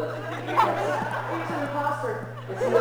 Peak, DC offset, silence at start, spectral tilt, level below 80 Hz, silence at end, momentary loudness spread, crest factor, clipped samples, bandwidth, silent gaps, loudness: -6 dBFS; 0.2%; 0 s; -6 dB/octave; -62 dBFS; 0 s; 9 LU; 20 dB; under 0.1%; over 20 kHz; none; -27 LUFS